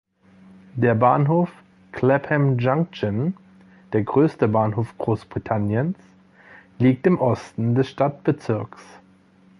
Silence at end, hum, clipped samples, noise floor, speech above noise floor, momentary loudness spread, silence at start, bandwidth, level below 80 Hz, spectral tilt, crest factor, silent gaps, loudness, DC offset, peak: 0.75 s; none; under 0.1%; -54 dBFS; 33 dB; 10 LU; 0.75 s; 10.5 kHz; -54 dBFS; -9 dB/octave; 18 dB; none; -21 LUFS; under 0.1%; -4 dBFS